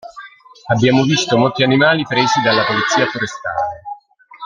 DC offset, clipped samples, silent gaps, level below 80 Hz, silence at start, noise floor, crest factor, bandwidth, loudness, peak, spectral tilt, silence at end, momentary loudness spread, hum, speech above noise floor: under 0.1%; under 0.1%; none; -54 dBFS; 0.05 s; -41 dBFS; 14 dB; 9.8 kHz; -15 LUFS; -2 dBFS; -4.5 dB/octave; 0 s; 14 LU; none; 27 dB